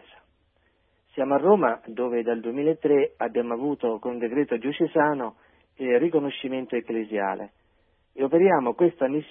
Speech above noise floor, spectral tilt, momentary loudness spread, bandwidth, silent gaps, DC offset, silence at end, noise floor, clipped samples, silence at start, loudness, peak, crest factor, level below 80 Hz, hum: 43 dB; -11 dB/octave; 10 LU; 3.7 kHz; none; under 0.1%; 0.05 s; -67 dBFS; under 0.1%; 1.15 s; -24 LUFS; -8 dBFS; 18 dB; -70 dBFS; none